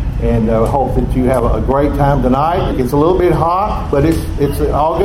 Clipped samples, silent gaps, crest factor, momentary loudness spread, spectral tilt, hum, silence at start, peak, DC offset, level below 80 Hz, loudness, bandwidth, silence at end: under 0.1%; none; 12 dB; 4 LU; -8 dB/octave; none; 0 s; 0 dBFS; under 0.1%; -20 dBFS; -14 LUFS; 16 kHz; 0 s